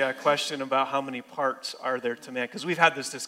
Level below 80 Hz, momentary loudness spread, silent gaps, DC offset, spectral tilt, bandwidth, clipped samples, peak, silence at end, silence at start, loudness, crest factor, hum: -80 dBFS; 10 LU; none; under 0.1%; -3 dB/octave; 16 kHz; under 0.1%; -6 dBFS; 0 s; 0 s; -27 LUFS; 22 dB; none